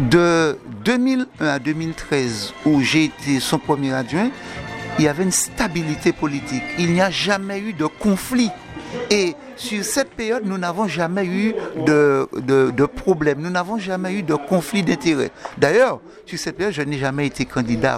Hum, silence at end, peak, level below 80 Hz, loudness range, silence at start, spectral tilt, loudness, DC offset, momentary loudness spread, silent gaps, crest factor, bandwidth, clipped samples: none; 0 s; 0 dBFS; -46 dBFS; 2 LU; 0 s; -5 dB/octave; -20 LUFS; under 0.1%; 8 LU; none; 20 dB; 15.5 kHz; under 0.1%